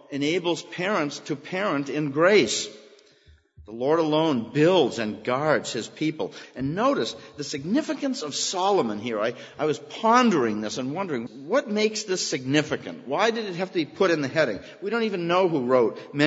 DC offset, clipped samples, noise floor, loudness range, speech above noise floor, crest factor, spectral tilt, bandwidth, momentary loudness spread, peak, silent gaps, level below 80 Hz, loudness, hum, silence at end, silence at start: under 0.1%; under 0.1%; -57 dBFS; 3 LU; 33 dB; 22 dB; -4.5 dB/octave; 8 kHz; 10 LU; -4 dBFS; none; -66 dBFS; -25 LUFS; none; 0 s; 0.1 s